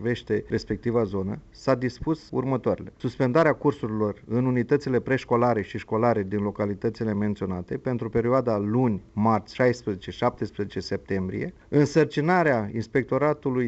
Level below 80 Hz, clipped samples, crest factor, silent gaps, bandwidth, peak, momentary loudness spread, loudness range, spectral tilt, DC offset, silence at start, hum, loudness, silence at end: -52 dBFS; under 0.1%; 16 dB; none; 8.2 kHz; -8 dBFS; 9 LU; 2 LU; -7.5 dB/octave; under 0.1%; 0 s; none; -25 LUFS; 0 s